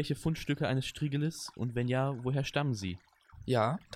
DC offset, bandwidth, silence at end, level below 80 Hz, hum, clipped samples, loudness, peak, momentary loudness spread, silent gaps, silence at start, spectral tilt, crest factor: under 0.1%; 14.5 kHz; 0 s; -58 dBFS; none; under 0.1%; -33 LUFS; -14 dBFS; 7 LU; none; 0 s; -6 dB/octave; 18 dB